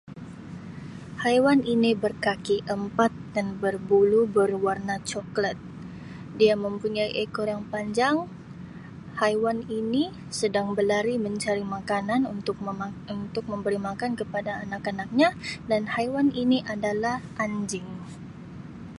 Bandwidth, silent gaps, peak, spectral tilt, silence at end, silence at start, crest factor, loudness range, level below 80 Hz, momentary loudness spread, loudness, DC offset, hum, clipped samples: 11.5 kHz; none; -8 dBFS; -5.5 dB/octave; 0 s; 0.05 s; 18 dB; 4 LU; -56 dBFS; 18 LU; -26 LUFS; under 0.1%; none; under 0.1%